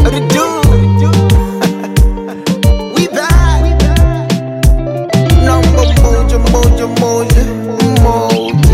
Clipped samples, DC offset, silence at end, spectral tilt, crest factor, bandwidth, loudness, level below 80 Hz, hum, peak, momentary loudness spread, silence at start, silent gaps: under 0.1%; under 0.1%; 0 s; -6 dB/octave; 8 dB; 16 kHz; -11 LUFS; -12 dBFS; none; 0 dBFS; 5 LU; 0 s; none